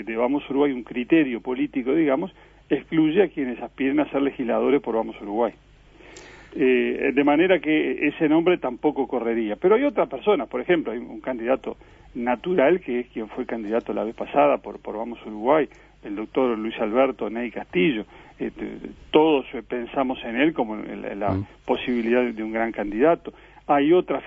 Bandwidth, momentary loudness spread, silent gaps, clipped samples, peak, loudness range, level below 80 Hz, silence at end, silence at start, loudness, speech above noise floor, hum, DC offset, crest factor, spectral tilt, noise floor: 7.6 kHz; 12 LU; none; under 0.1%; -2 dBFS; 4 LU; -54 dBFS; 0 s; 0 s; -23 LUFS; 26 dB; none; under 0.1%; 20 dB; -7.5 dB/octave; -48 dBFS